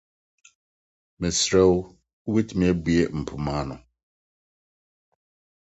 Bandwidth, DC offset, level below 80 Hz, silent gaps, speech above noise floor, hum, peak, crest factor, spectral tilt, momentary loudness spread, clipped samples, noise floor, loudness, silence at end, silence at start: 8.2 kHz; under 0.1%; -44 dBFS; 2.13-2.25 s; over 68 dB; none; -6 dBFS; 20 dB; -5 dB/octave; 17 LU; under 0.1%; under -90 dBFS; -23 LUFS; 1.8 s; 1.2 s